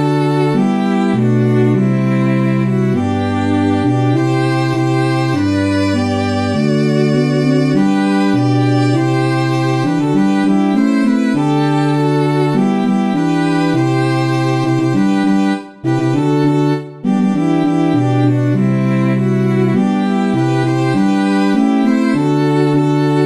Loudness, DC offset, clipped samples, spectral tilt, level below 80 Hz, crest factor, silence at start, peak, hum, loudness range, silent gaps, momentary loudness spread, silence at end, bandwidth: -14 LUFS; 0.3%; under 0.1%; -7.5 dB/octave; -56 dBFS; 12 dB; 0 s; -2 dBFS; none; 1 LU; none; 2 LU; 0 s; 11.5 kHz